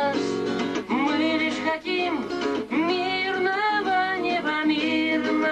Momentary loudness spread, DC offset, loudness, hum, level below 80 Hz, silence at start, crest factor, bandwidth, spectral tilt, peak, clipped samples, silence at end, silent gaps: 4 LU; under 0.1%; -24 LUFS; none; -62 dBFS; 0 s; 12 dB; 9.4 kHz; -4.5 dB/octave; -12 dBFS; under 0.1%; 0 s; none